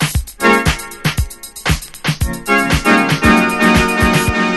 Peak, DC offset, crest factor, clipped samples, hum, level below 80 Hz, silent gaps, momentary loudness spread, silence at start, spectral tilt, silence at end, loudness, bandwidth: 0 dBFS; under 0.1%; 14 dB; under 0.1%; none; -24 dBFS; none; 9 LU; 0 s; -4.5 dB/octave; 0 s; -14 LUFS; 12.5 kHz